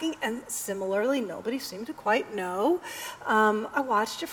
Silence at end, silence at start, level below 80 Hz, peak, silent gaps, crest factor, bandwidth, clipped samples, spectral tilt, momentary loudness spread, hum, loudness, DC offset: 0 s; 0 s; -68 dBFS; -10 dBFS; none; 18 dB; over 20 kHz; under 0.1%; -3.5 dB/octave; 9 LU; none; -28 LUFS; under 0.1%